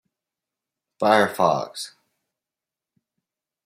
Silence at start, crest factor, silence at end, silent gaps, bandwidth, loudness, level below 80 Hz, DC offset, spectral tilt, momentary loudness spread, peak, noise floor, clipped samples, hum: 1 s; 24 dB; 1.75 s; none; 16 kHz; -20 LUFS; -72 dBFS; under 0.1%; -4.5 dB/octave; 16 LU; -2 dBFS; -89 dBFS; under 0.1%; none